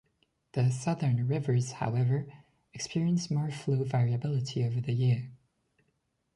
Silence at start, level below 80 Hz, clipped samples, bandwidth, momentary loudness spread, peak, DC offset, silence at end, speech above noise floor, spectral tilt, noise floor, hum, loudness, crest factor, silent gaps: 0.55 s; -66 dBFS; under 0.1%; 11 kHz; 7 LU; -18 dBFS; under 0.1%; 1 s; 48 dB; -7 dB/octave; -77 dBFS; none; -30 LUFS; 12 dB; none